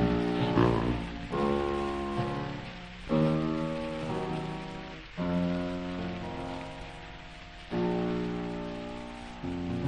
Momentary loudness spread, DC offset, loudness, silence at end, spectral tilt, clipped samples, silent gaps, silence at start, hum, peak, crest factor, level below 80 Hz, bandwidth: 15 LU; under 0.1%; -32 LUFS; 0 s; -7.5 dB/octave; under 0.1%; none; 0 s; none; -12 dBFS; 20 dB; -46 dBFS; 10 kHz